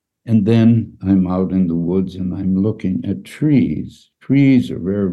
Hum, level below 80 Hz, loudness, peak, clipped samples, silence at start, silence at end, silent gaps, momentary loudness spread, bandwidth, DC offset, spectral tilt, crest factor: none; -46 dBFS; -17 LUFS; -2 dBFS; under 0.1%; 0.25 s; 0 s; none; 10 LU; 11.5 kHz; under 0.1%; -9.5 dB/octave; 14 dB